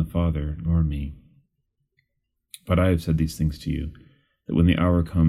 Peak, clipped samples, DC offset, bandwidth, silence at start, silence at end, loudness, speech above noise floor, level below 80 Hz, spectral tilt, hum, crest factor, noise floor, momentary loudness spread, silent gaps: -8 dBFS; under 0.1%; under 0.1%; 13 kHz; 0 s; 0 s; -24 LUFS; 55 dB; -36 dBFS; -8 dB/octave; none; 16 dB; -76 dBFS; 15 LU; none